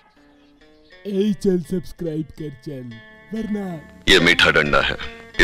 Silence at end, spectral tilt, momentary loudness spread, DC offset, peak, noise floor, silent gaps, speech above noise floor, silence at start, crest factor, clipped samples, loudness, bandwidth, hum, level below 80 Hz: 0 s; -4 dB/octave; 21 LU; under 0.1%; -2 dBFS; -53 dBFS; none; 33 dB; 1.05 s; 20 dB; under 0.1%; -19 LUFS; 15.5 kHz; none; -38 dBFS